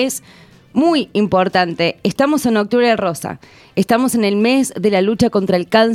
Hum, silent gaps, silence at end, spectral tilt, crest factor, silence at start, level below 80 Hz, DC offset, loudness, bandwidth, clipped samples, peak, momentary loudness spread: none; none; 0 s; -5 dB/octave; 16 dB; 0 s; -50 dBFS; under 0.1%; -16 LUFS; 16 kHz; under 0.1%; 0 dBFS; 8 LU